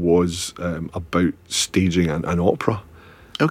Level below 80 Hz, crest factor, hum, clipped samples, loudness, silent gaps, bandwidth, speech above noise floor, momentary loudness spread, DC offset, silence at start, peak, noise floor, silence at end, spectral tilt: -44 dBFS; 20 dB; none; under 0.1%; -22 LUFS; none; 15.5 kHz; 19 dB; 9 LU; under 0.1%; 0 s; -2 dBFS; -40 dBFS; 0 s; -5 dB/octave